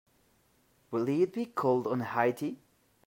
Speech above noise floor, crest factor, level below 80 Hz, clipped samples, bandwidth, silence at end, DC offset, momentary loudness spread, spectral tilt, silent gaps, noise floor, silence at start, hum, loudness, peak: 39 dB; 20 dB; -78 dBFS; under 0.1%; 16 kHz; 0.5 s; under 0.1%; 9 LU; -7.5 dB/octave; none; -69 dBFS; 0.9 s; none; -31 LUFS; -12 dBFS